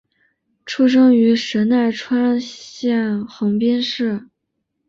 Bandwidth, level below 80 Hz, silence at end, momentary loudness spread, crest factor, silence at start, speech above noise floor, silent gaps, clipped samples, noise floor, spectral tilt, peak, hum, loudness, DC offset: 7.4 kHz; -62 dBFS; 0.65 s; 11 LU; 14 dB; 0.65 s; 58 dB; none; under 0.1%; -74 dBFS; -5.5 dB/octave; -4 dBFS; none; -17 LUFS; under 0.1%